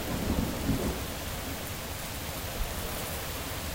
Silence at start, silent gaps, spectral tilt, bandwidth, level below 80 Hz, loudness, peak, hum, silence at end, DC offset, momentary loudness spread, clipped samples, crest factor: 0 s; none; -4 dB/octave; 16.5 kHz; -40 dBFS; -34 LUFS; -16 dBFS; none; 0 s; 0.1%; 5 LU; under 0.1%; 18 dB